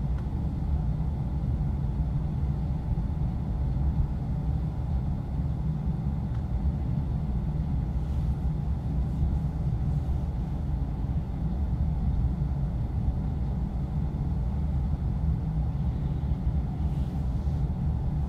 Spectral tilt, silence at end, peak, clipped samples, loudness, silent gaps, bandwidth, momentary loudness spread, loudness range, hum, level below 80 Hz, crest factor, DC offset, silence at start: -10 dB/octave; 0 s; -14 dBFS; under 0.1%; -30 LUFS; none; 4.9 kHz; 2 LU; 1 LU; none; -30 dBFS; 14 dB; under 0.1%; 0 s